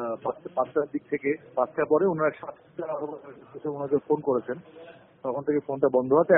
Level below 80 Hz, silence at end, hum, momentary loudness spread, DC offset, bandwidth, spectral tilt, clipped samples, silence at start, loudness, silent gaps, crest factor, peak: -68 dBFS; 0 s; none; 15 LU; under 0.1%; 3.7 kHz; -2.5 dB/octave; under 0.1%; 0 s; -28 LUFS; none; 20 dB; -6 dBFS